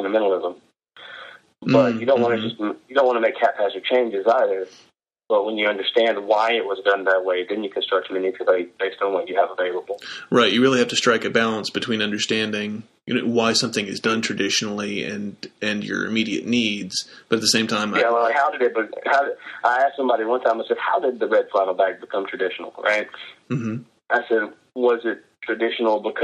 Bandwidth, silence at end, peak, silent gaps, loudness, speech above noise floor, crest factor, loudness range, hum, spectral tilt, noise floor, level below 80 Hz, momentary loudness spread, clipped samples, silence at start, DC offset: 13 kHz; 0 s; -2 dBFS; none; -21 LUFS; 22 dB; 18 dB; 3 LU; none; -3.5 dB/octave; -43 dBFS; -68 dBFS; 10 LU; under 0.1%; 0 s; under 0.1%